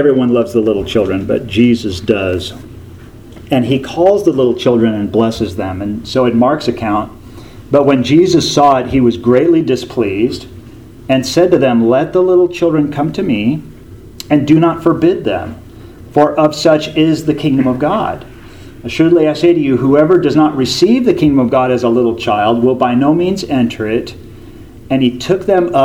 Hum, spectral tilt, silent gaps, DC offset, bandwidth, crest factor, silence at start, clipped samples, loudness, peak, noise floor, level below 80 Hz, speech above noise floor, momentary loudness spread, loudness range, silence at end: none; -6.5 dB/octave; none; under 0.1%; 15 kHz; 12 dB; 0 s; under 0.1%; -12 LUFS; 0 dBFS; -34 dBFS; -40 dBFS; 22 dB; 9 LU; 3 LU; 0 s